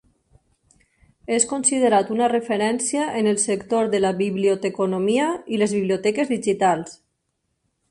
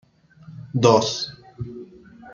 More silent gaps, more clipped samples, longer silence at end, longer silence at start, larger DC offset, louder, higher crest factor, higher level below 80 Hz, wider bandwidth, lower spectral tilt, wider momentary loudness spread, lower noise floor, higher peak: neither; neither; first, 0.95 s vs 0.05 s; first, 1.3 s vs 0.5 s; neither; about the same, -21 LUFS vs -20 LUFS; about the same, 18 dB vs 22 dB; about the same, -62 dBFS vs -58 dBFS; first, 11.5 kHz vs 7.6 kHz; about the same, -4 dB/octave vs -5 dB/octave; second, 4 LU vs 22 LU; first, -74 dBFS vs -48 dBFS; about the same, -4 dBFS vs -2 dBFS